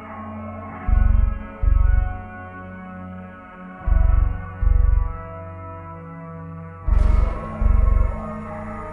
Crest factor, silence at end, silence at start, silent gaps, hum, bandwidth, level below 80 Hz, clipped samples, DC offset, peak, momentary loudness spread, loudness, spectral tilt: 14 dB; 0 s; 0 s; none; none; 3 kHz; -20 dBFS; under 0.1%; under 0.1%; -6 dBFS; 16 LU; -23 LUFS; -10 dB/octave